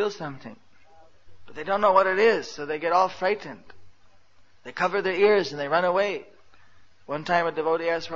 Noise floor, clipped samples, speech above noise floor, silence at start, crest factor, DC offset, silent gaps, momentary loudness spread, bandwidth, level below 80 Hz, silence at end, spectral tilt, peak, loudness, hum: -60 dBFS; under 0.1%; 36 dB; 0 s; 22 dB; 0.4%; none; 18 LU; 7.6 kHz; -64 dBFS; 0 s; -5 dB/octave; -4 dBFS; -24 LUFS; none